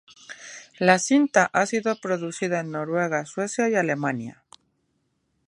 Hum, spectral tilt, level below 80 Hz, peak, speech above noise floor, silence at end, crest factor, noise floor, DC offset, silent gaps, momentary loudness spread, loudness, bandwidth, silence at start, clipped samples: none; -4.5 dB/octave; -72 dBFS; -2 dBFS; 49 dB; 1.15 s; 24 dB; -72 dBFS; under 0.1%; none; 20 LU; -23 LUFS; 11.5 kHz; 0.3 s; under 0.1%